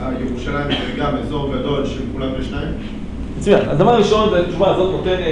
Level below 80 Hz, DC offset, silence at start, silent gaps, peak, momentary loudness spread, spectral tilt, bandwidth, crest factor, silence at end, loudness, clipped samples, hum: -30 dBFS; under 0.1%; 0 s; none; -2 dBFS; 12 LU; -6.5 dB/octave; 10.5 kHz; 16 dB; 0 s; -18 LUFS; under 0.1%; none